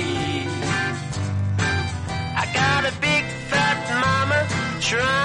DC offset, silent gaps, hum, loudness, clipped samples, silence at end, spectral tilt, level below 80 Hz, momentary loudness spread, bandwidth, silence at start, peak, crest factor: under 0.1%; none; none; -22 LUFS; under 0.1%; 0 s; -4 dB/octave; -44 dBFS; 6 LU; 11 kHz; 0 s; -8 dBFS; 14 dB